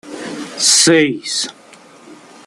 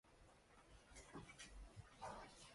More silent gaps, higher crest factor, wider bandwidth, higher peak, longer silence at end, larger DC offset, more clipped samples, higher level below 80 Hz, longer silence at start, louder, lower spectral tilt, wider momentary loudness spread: neither; about the same, 18 dB vs 18 dB; first, 14 kHz vs 11.5 kHz; first, 0 dBFS vs -42 dBFS; first, 0.3 s vs 0 s; neither; neither; about the same, -64 dBFS vs -68 dBFS; about the same, 0.05 s vs 0.05 s; first, -12 LUFS vs -60 LUFS; second, -2 dB/octave vs -3.5 dB/octave; first, 18 LU vs 13 LU